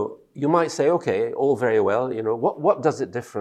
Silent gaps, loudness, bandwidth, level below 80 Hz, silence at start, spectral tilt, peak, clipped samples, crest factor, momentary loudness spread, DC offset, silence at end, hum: none; -22 LUFS; 12 kHz; -70 dBFS; 0 s; -6.5 dB/octave; -6 dBFS; under 0.1%; 16 dB; 7 LU; under 0.1%; 0 s; none